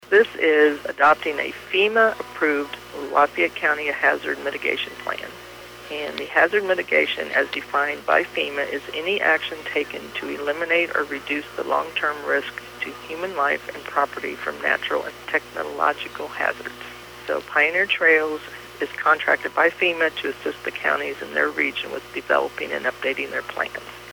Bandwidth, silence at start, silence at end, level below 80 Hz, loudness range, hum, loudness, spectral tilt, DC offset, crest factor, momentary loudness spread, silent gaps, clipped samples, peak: over 20 kHz; 0 s; 0 s; -58 dBFS; 5 LU; none; -22 LUFS; -3.5 dB/octave; under 0.1%; 18 dB; 12 LU; none; under 0.1%; -4 dBFS